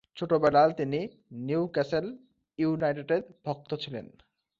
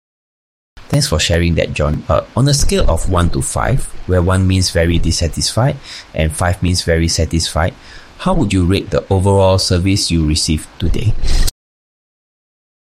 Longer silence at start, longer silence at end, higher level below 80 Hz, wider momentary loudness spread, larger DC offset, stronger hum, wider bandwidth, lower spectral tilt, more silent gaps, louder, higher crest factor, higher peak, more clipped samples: second, 0.15 s vs 0.8 s; second, 0.55 s vs 1.45 s; second, -66 dBFS vs -22 dBFS; first, 17 LU vs 6 LU; neither; neither; second, 7.4 kHz vs 15.5 kHz; first, -8 dB/octave vs -5 dB/octave; neither; second, -28 LUFS vs -15 LUFS; first, 20 dB vs 14 dB; second, -10 dBFS vs -2 dBFS; neither